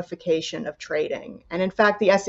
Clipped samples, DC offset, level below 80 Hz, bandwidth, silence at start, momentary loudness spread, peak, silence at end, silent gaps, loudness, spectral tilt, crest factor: under 0.1%; under 0.1%; -60 dBFS; 8 kHz; 0 s; 14 LU; -6 dBFS; 0 s; none; -24 LUFS; -4.5 dB/octave; 18 dB